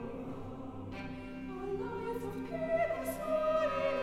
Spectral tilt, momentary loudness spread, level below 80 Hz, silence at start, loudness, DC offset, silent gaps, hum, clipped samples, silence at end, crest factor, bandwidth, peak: -6 dB/octave; 12 LU; -56 dBFS; 0 s; -37 LUFS; under 0.1%; none; none; under 0.1%; 0 s; 14 dB; 16 kHz; -22 dBFS